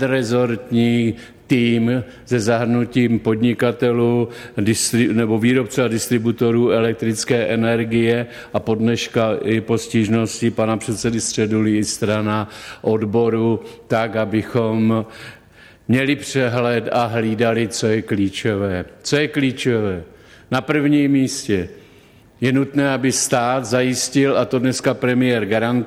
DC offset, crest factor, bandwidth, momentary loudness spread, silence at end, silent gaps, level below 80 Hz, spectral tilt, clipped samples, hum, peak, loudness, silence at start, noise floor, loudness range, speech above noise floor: under 0.1%; 14 dB; 15.5 kHz; 6 LU; 0 s; none; -52 dBFS; -5 dB/octave; under 0.1%; none; -4 dBFS; -18 LUFS; 0 s; -48 dBFS; 2 LU; 30 dB